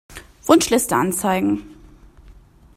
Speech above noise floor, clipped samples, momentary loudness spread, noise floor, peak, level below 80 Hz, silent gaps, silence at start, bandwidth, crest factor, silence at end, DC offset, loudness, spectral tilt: 29 dB; under 0.1%; 10 LU; -46 dBFS; 0 dBFS; -48 dBFS; none; 0.1 s; 16 kHz; 20 dB; 0.45 s; under 0.1%; -18 LUFS; -4 dB/octave